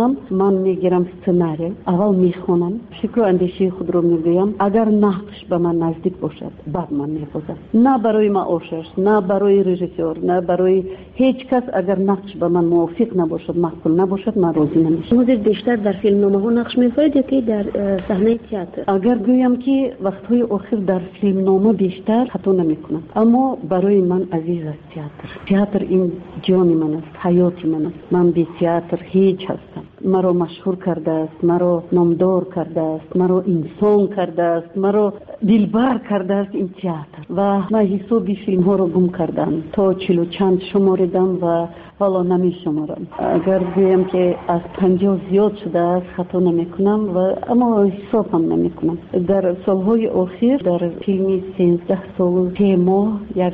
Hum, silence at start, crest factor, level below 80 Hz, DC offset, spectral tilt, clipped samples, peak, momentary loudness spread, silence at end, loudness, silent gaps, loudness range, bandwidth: none; 0 s; 12 dB; -50 dBFS; under 0.1%; -8 dB/octave; under 0.1%; -4 dBFS; 8 LU; 0 s; -18 LUFS; none; 2 LU; 4.6 kHz